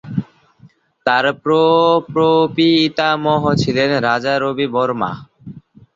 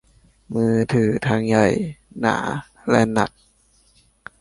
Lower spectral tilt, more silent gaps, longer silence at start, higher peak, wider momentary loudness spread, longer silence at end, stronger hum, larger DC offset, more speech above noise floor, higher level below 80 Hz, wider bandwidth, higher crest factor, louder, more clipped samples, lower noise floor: about the same, -6 dB/octave vs -6.5 dB/octave; neither; second, 0.05 s vs 0.5 s; about the same, -2 dBFS vs -2 dBFS; about the same, 9 LU vs 10 LU; second, 0.35 s vs 1.1 s; neither; neither; second, 34 dB vs 39 dB; about the same, -52 dBFS vs -50 dBFS; second, 7.6 kHz vs 11.5 kHz; about the same, 16 dB vs 20 dB; first, -15 LUFS vs -20 LUFS; neither; second, -49 dBFS vs -58 dBFS